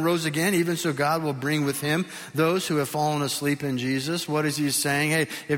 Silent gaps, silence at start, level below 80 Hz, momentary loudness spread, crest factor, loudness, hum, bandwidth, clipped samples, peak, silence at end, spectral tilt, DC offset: none; 0 s; -66 dBFS; 4 LU; 16 dB; -25 LUFS; none; 17 kHz; under 0.1%; -10 dBFS; 0 s; -4.5 dB/octave; under 0.1%